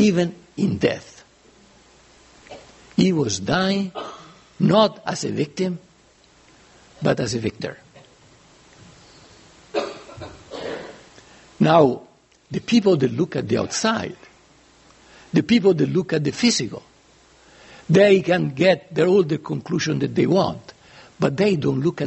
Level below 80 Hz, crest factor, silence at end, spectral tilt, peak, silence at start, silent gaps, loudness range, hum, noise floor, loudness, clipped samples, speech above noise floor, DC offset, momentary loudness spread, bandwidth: -56 dBFS; 20 dB; 0 s; -5.5 dB/octave; 0 dBFS; 0 s; none; 10 LU; none; -54 dBFS; -20 LUFS; under 0.1%; 35 dB; under 0.1%; 17 LU; 8.2 kHz